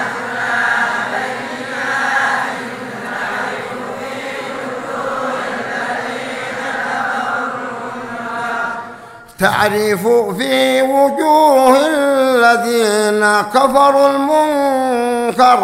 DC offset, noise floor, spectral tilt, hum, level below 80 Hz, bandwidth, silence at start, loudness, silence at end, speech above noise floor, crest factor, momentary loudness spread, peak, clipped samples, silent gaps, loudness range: under 0.1%; -35 dBFS; -3.5 dB/octave; none; -54 dBFS; 16 kHz; 0 s; -15 LUFS; 0 s; 23 dB; 14 dB; 13 LU; 0 dBFS; under 0.1%; none; 10 LU